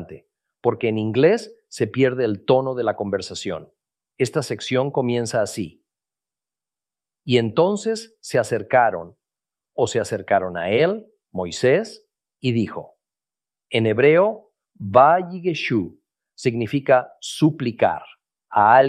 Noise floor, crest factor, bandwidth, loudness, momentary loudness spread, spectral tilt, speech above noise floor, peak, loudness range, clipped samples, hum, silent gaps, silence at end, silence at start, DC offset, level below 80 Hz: under -90 dBFS; 20 dB; 13 kHz; -21 LUFS; 15 LU; -5.5 dB/octave; over 70 dB; -2 dBFS; 5 LU; under 0.1%; none; none; 0 s; 0 s; under 0.1%; -64 dBFS